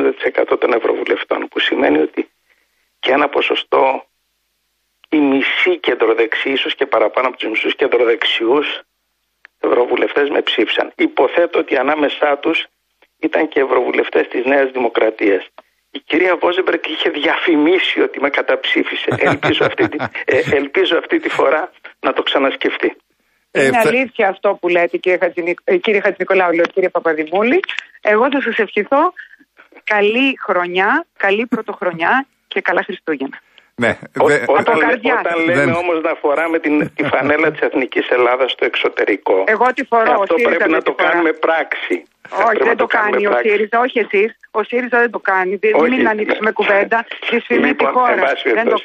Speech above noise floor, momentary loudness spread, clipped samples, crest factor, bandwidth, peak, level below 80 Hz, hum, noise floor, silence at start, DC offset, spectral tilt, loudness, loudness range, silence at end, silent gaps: 53 dB; 6 LU; under 0.1%; 14 dB; 14.5 kHz; -2 dBFS; -60 dBFS; none; -68 dBFS; 0 s; under 0.1%; -5 dB/octave; -15 LUFS; 2 LU; 0 s; none